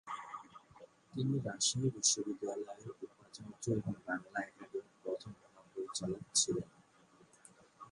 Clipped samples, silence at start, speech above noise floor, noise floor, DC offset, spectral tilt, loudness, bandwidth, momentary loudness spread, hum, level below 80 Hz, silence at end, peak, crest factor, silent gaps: under 0.1%; 0.05 s; 28 dB; -66 dBFS; under 0.1%; -3 dB/octave; -37 LUFS; 11.5 kHz; 20 LU; none; -70 dBFS; 0 s; -16 dBFS; 24 dB; none